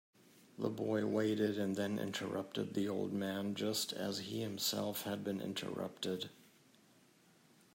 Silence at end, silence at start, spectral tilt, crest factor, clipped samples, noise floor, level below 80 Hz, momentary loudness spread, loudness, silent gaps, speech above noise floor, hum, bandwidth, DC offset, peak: 1.35 s; 0.35 s; -4.5 dB/octave; 18 dB; under 0.1%; -68 dBFS; -82 dBFS; 6 LU; -39 LUFS; none; 29 dB; none; 16 kHz; under 0.1%; -22 dBFS